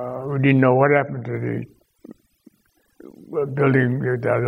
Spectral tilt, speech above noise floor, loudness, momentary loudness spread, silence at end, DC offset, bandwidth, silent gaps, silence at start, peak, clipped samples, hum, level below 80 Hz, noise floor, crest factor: -10 dB/octave; 45 dB; -20 LUFS; 13 LU; 0 s; under 0.1%; 4 kHz; none; 0 s; -2 dBFS; under 0.1%; none; -62 dBFS; -64 dBFS; 18 dB